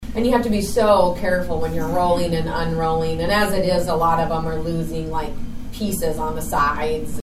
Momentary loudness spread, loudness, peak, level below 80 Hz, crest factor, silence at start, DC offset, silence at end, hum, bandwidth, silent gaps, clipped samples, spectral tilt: 8 LU; -21 LUFS; -2 dBFS; -32 dBFS; 16 dB; 0 s; under 0.1%; 0 s; none; 15.5 kHz; none; under 0.1%; -5.5 dB/octave